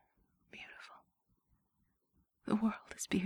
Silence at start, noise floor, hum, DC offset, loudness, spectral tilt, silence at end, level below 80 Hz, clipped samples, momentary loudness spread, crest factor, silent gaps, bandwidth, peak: 0.55 s; -80 dBFS; none; under 0.1%; -37 LUFS; -5 dB/octave; 0 s; -70 dBFS; under 0.1%; 20 LU; 22 dB; none; 13.5 kHz; -20 dBFS